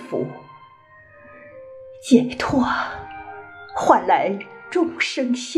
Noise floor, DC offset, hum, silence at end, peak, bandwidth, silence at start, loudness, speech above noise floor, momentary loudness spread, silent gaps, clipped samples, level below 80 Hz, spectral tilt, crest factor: -49 dBFS; under 0.1%; none; 0 s; -2 dBFS; 11.5 kHz; 0 s; -21 LUFS; 29 dB; 24 LU; none; under 0.1%; -54 dBFS; -4.5 dB/octave; 22 dB